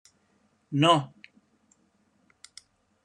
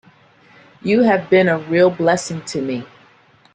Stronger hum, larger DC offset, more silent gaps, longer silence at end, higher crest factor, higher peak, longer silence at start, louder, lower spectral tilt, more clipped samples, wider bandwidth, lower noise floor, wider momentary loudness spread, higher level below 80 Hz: neither; neither; neither; first, 2 s vs 0.7 s; first, 24 dB vs 16 dB; second, -8 dBFS vs -2 dBFS; second, 0.7 s vs 0.85 s; second, -24 LUFS vs -17 LUFS; about the same, -5.5 dB/octave vs -5.5 dB/octave; neither; first, 11 kHz vs 9.8 kHz; first, -68 dBFS vs -52 dBFS; first, 28 LU vs 11 LU; second, -80 dBFS vs -60 dBFS